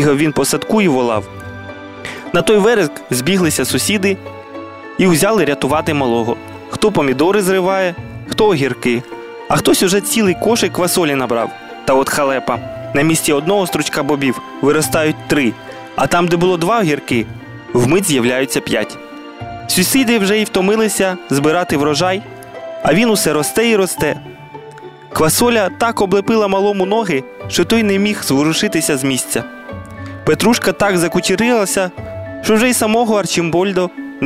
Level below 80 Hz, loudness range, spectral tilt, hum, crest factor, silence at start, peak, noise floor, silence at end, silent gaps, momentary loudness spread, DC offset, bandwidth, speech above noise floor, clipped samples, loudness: -44 dBFS; 1 LU; -4 dB/octave; none; 14 dB; 0 s; -2 dBFS; -34 dBFS; 0 s; none; 16 LU; 0.2%; 16 kHz; 20 dB; under 0.1%; -14 LUFS